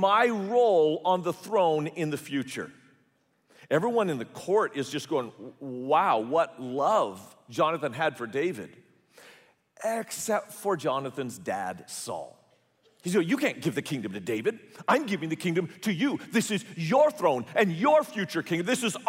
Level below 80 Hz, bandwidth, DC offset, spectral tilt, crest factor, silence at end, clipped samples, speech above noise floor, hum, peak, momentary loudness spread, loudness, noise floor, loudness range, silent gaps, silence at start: -76 dBFS; 16 kHz; under 0.1%; -5 dB/octave; 18 dB; 0 s; under 0.1%; 42 dB; none; -10 dBFS; 12 LU; -28 LUFS; -69 dBFS; 6 LU; none; 0 s